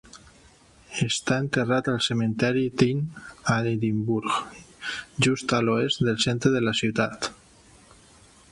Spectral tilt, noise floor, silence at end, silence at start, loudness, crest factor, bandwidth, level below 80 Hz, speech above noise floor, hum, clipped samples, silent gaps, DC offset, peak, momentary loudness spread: -5 dB/octave; -54 dBFS; 1.2 s; 0.15 s; -25 LUFS; 18 dB; 11.5 kHz; -56 dBFS; 30 dB; none; under 0.1%; none; under 0.1%; -6 dBFS; 10 LU